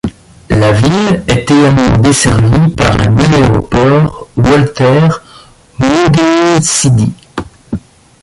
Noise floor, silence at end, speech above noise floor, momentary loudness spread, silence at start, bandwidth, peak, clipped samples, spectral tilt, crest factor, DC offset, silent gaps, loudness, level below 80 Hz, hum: -38 dBFS; 0.45 s; 30 dB; 14 LU; 0.05 s; 11.5 kHz; 0 dBFS; under 0.1%; -5.5 dB/octave; 10 dB; under 0.1%; none; -9 LUFS; -26 dBFS; none